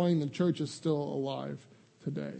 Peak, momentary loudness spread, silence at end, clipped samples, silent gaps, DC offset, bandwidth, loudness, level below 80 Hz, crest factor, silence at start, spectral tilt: -16 dBFS; 13 LU; 0 s; under 0.1%; none; under 0.1%; 8.8 kHz; -33 LUFS; -76 dBFS; 16 dB; 0 s; -7 dB/octave